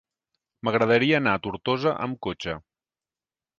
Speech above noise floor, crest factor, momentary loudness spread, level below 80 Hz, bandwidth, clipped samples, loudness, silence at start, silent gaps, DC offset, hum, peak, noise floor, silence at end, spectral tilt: over 66 dB; 20 dB; 13 LU; -58 dBFS; 7.4 kHz; under 0.1%; -24 LUFS; 0.65 s; none; under 0.1%; none; -6 dBFS; under -90 dBFS; 1 s; -6.5 dB/octave